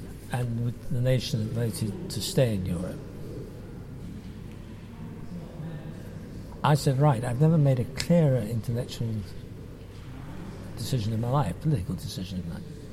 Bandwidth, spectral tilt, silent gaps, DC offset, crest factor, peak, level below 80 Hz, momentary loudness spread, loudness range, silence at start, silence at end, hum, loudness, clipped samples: 15.5 kHz; -6.5 dB/octave; none; under 0.1%; 20 dB; -8 dBFS; -46 dBFS; 19 LU; 13 LU; 0 s; 0 s; none; -27 LUFS; under 0.1%